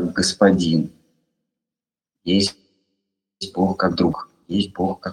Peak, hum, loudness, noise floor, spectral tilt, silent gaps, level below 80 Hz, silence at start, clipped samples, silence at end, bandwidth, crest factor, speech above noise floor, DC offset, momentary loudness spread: -2 dBFS; none; -20 LUFS; -90 dBFS; -5 dB/octave; none; -52 dBFS; 0 s; under 0.1%; 0 s; 12 kHz; 20 dB; 70 dB; under 0.1%; 15 LU